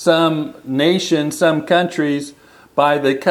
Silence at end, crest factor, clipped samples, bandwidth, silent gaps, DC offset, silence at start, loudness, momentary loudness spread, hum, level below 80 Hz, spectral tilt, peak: 0 s; 16 dB; under 0.1%; 15 kHz; none; under 0.1%; 0 s; -17 LUFS; 9 LU; none; -64 dBFS; -5 dB/octave; 0 dBFS